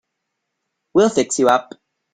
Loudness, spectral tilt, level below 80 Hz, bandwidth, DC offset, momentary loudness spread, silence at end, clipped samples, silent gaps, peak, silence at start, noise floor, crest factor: -17 LUFS; -4 dB/octave; -60 dBFS; 14.5 kHz; under 0.1%; 4 LU; 0.5 s; under 0.1%; none; -2 dBFS; 0.95 s; -77 dBFS; 18 dB